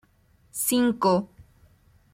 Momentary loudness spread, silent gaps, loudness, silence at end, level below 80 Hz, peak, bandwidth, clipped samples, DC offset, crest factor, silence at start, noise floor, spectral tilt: 16 LU; none; -24 LUFS; 0.7 s; -60 dBFS; -8 dBFS; 16.5 kHz; under 0.1%; under 0.1%; 18 dB; 0.55 s; -61 dBFS; -4.5 dB/octave